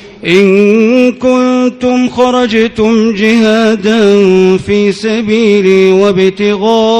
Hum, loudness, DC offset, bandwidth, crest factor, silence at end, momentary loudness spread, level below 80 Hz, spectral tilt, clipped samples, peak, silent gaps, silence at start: none; -8 LUFS; under 0.1%; 10.5 kHz; 8 dB; 0 s; 4 LU; -44 dBFS; -6 dB/octave; 3%; 0 dBFS; none; 0 s